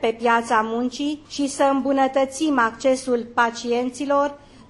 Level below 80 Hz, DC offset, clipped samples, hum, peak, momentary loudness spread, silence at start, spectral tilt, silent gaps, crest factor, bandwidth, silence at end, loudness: -56 dBFS; under 0.1%; under 0.1%; none; -6 dBFS; 7 LU; 0 s; -3.5 dB/octave; none; 16 dB; 11.5 kHz; 0.1 s; -21 LUFS